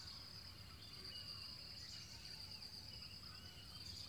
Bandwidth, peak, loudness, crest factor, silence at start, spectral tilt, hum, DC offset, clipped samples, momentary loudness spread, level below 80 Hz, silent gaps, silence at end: 19.5 kHz; -40 dBFS; -52 LUFS; 14 dB; 0 s; -2.5 dB/octave; none; under 0.1%; under 0.1%; 5 LU; -68 dBFS; none; 0 s